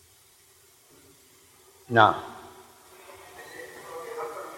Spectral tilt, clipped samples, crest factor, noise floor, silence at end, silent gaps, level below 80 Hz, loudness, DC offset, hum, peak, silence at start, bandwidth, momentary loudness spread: -5 dB/octave; under 0.1%; 28 dB; -58 dBFS; 0 s; none; -70 dBFS; -24 LUFS; under 0.1%; none; -2 dBFS; 1.9 s; 16.5 kHz; 28 LU